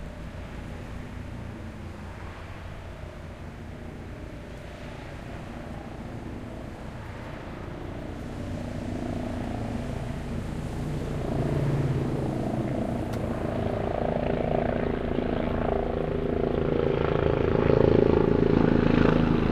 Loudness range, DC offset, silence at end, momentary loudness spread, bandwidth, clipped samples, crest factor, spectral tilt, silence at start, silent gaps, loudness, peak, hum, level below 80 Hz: 16 LU; under 0.1%; 0 s; 18 LU; 13.5 kHz; under 0.1%; 22 dB; -8 dB/octave; 0 s; none; -27 LUFS; -6 dBFS; none; -38 dBFS